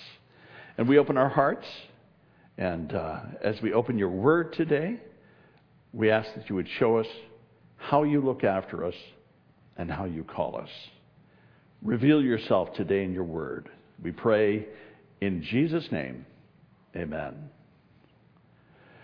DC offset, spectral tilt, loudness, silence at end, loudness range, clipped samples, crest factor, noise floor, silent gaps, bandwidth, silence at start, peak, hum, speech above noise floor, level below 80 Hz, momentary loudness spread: under 0.1%; -9 dB/octave; -28 LUFS; 1.55 s; 6 LU; under 0.1%; 22 dB; -60 dBFS; none; 5.4 kHz; 0 s; -6 dBFS; none; 33 dB; -60 dBFS; 20 LU